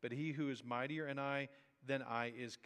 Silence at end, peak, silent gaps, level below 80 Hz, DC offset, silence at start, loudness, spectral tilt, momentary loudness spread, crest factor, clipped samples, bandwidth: 0.1 s; -24 dBFS; none; under -90 dBFS; under 0.1%; 0 s; -43 LUFS; -6 dB/octave; 4 LU; 18 dB; under 0.1%; 11.5 kHz